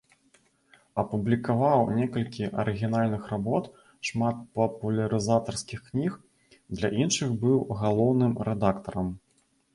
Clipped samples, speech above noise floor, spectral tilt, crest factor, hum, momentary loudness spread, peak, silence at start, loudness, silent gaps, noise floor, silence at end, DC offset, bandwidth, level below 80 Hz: under 0.1%; 42 dB; -6 dB/octave; 18 dB; none; 10 LU; -10 dBFS; 0.95 s; -27 LUFS; none; -68 dBFS; 0.55 s; under 0.1%; 11.5 kHz; -54 dBFS